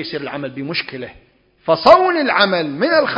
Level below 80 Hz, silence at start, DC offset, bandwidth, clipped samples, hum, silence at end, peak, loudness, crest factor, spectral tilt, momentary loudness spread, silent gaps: -54 dBFS; 0 s; under 0.1%; 8 kHz; 0.1%; none; 0 s; 0 dBFS; -15 LUFS; 16 dB; -6 dB/octave; 18 LU; none